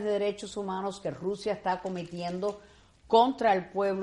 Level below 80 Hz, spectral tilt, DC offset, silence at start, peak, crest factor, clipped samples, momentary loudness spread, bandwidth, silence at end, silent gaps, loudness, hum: -62 dBFS; -5.5 dB/octave; under 0.1%; 0 s; -8 dBFS; 20 dB; under 0.1%; 12 LU; 11.5 kHz; 0 s; none; -30 LUFS; none